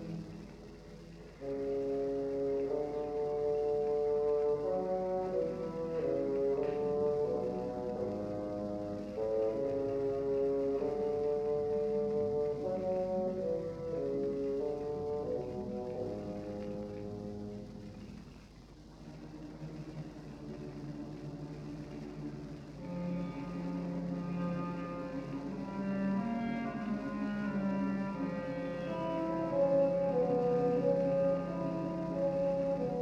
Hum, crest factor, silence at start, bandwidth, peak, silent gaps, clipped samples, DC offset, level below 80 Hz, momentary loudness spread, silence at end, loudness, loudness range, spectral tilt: none; 16 dB; 0 s; 8.2 kHz; -20 dBFS; none; under 0.1%; under 0.1%; -58 dBFS; 15 LU; 0 s; -36 LUFS; 13 LU; -8.5 dB/octave